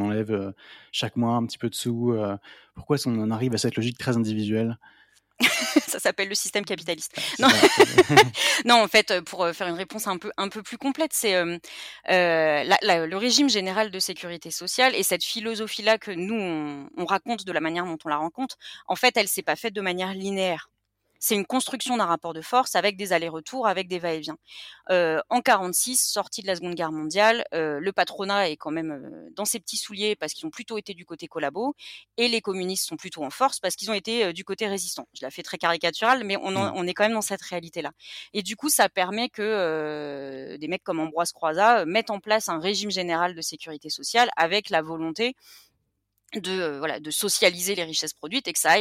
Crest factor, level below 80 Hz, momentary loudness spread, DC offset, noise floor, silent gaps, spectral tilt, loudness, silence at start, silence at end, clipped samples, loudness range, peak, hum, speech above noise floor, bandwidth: 20 dB; -68 dBFS; 13 LU; under 0.1%; -75 dBFS; none; -3 dB/octave; -24 LUFS; 0 s; 0 s; under 0.1%; 8 LU; -4 dBFS; none; 50 dB; 16.5 kHz